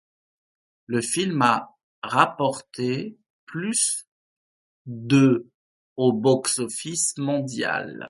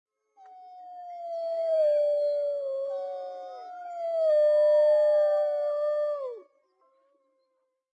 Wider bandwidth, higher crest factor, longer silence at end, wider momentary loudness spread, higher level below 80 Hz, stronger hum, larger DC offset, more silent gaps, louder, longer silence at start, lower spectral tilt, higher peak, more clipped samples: first, 12 kHz vs 7.6 kHz; first, 24 dB vs 12 dB; second, 0 s vs 1.55 s; second, 12 LU vs 20 LU; first, -68 dBFS vs under -90 dBFS; neither; neither; first, 1.83-2.02 s, 3.30-3.47 s, 4.07-4.85 s, 5.54-5.96 s vs none; first, -23 LUFS vs -26 LUFS; first, 0.9 s vs 0.45 s; first, -4 dB/octave vs -0.5 dB/octave; first, -2 dBFS vs -16 dBFS; neither